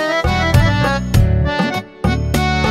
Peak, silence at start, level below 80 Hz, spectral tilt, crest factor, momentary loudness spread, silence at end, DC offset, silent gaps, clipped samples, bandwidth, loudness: 0 dBFS; 0 s; -22 dBFS; -6 dB/octave; 14 dB; 6 LU; 0 s; under 0.1%; none; under 0.1%; 16 kHz; -16 LUFS